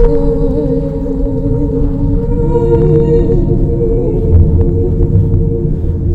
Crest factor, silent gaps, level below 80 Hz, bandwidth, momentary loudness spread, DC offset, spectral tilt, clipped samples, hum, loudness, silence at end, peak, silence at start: 10 dB; none; -14 dBFS; 4.1 kHz; 6 LU; under 0.1%; -12 dB/octave; 0.5%; none; -13 LUFS; 0 s; 0 dBFS; 0 s